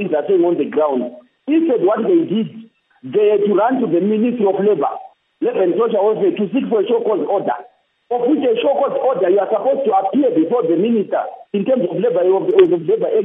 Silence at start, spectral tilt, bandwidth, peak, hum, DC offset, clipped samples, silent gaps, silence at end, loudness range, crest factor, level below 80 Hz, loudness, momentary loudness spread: 0 s; -10.5 dB/octave; 3.8 kHz; 0 dBFS; none; under 0.1%; under 0.1%; none; 0 s; 2 LU; 16 dB; -74 dBFS; -16 LUFS; 8 LU